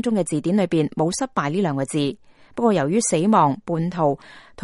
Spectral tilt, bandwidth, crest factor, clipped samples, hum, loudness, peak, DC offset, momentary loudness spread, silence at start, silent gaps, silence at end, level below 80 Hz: -5.5 dB/octave; 11.5 kHz; 18 dB; under 0.1%; none; -21 LUFS; -4 dBFS; under 0.1%; 7 LU; 0.05 s; none; 0 s; -58 dBFS